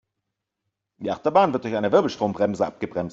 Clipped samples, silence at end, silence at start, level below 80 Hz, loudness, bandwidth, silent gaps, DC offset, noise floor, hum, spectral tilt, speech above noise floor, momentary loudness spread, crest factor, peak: under 0.1%; 0 s; 1 s; -62 dBFS; -23 LUFS; 7.8 kHz; none; under 0.1%; -82 dBFS; none; -6.5 dB/octave; 60 dB; 10 LU; 20 dB; -4 dBFS